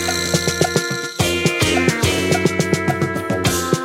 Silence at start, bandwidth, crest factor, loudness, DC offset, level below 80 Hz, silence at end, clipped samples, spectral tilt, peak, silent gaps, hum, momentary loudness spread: 0 s; 16.5 kHz; 18 dB; -18 LUFS; under 0.1%; -40 dBFS; 0 s; under 0.1%; -4 dB/octave; 0 dBFS; none; none; 4 LU